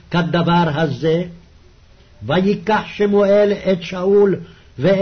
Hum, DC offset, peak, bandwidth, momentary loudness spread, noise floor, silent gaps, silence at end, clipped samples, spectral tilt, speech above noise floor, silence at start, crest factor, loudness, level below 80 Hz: none; under 0.1%; -6 dBFS; 6.6 kHz; 8 LU; -47 dBFS; none; 0 s; under 0.1%; -7.5 dB/octave; 31 dB; 0.1 s; 12 dB; -17 LUFS; -46 dBFS